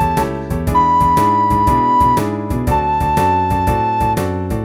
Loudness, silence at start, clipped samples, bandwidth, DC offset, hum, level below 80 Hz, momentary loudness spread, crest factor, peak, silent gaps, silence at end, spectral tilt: -15 LUFS; 0 s; under 0.1%; 19 kHz; under 0.1%; none; -28 dBFS; 7 LU; 12 dB; -2 dBFS; none; 0 s; -7 dB/octave